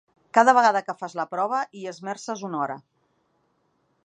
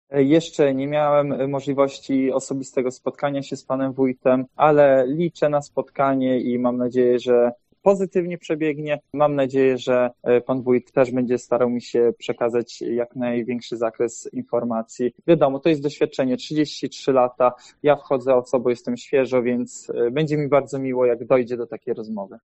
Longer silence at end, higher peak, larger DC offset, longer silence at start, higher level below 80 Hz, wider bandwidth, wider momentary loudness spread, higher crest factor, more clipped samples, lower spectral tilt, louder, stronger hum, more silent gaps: first, 1.25 s vs 0.1 s; about the same, -2 dBFS vs -2 dBFS; neither; first, 0.35 s vs 0.1 s; second, -84 dBFS vs -64 dBFS; first, 9.8 kHz vs 8.4 kHz; first, 16 LU vs 8 LU; about the same, 22 dB vs 18 dB; neither; second, -4 dB/octave vs -6.5 dB/octave; about the same, -23 LUFS vs -21 LUFS; neither; neither